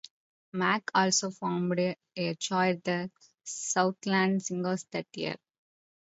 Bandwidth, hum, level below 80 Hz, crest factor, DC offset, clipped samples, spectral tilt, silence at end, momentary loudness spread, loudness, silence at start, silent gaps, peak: 8 kHz; none; -76 dBFS; 20 dB; under 0.1%; under 0.1%; -4 dB/octave; 0.7 s; 11 LU; -30 LUFS; 0.55 s; none; -10 dBFS